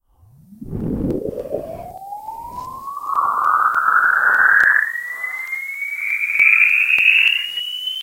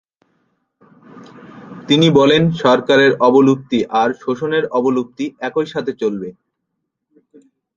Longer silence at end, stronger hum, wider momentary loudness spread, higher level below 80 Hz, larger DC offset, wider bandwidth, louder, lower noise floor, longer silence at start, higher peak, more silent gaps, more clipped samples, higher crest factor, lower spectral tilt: second, 0 s vs 1.45 s; neither; first, 20 LU vs 13 LU; first, -44 dBFS vs -58 dBFS; neither; first, 17 kHz vs 7.6 kHz; about the same, -15 LUFS vs -15 LUFS; second, -50 dBFS vs -75 dBFS; second, 0.5 s vs 1.15 s; about the same, 0 dBFS vs 0 dBFS; neither; neither; about the same, 18 dB vs 16 dB; second, -3.5 dB/octave vs -6 dB/octave